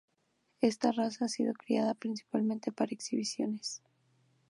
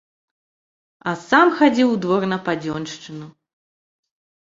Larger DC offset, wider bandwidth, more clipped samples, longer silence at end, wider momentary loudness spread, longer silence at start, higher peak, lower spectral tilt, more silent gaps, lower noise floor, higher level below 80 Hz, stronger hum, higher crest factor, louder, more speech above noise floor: neither; first, 11.5 kHz vs 7.8 kHz; neither; second, 0.7 s vs 1.1 s; second, 6 LU vs 18 LU; second, 0.6 s vs 1.05 s; second, -14 dBFS vs -2 dBFS; about the same, -4.5 dB/octave vs -5.5 dB/octave; neither; second, -77 dBFS vs under -90 dBFS; second, -86 dBFS vs -64 dBFS; neither; about the same, 22 dB vs 20 dB; second, -34 LUFS vs -18 LUFS; second, 44 dB vs over 71 dB